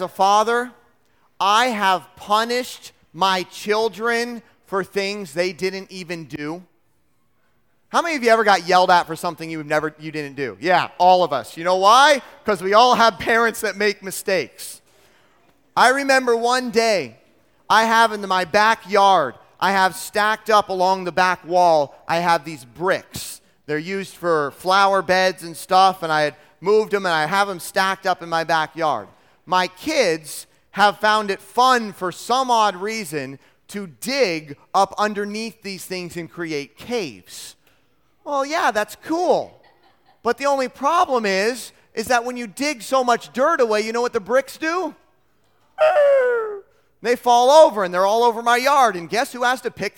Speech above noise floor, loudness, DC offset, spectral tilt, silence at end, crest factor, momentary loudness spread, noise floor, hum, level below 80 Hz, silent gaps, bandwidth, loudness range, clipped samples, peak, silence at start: 48 dB; -19 LUFS; under 0.1%; -3 dB/octave; 0.1 s; 20 dB; 15 LU; -67 dBFS; none; -62 dBFS; none; 18 kHz; 7 LU; under 0.1%; 0 dBFS; 0 s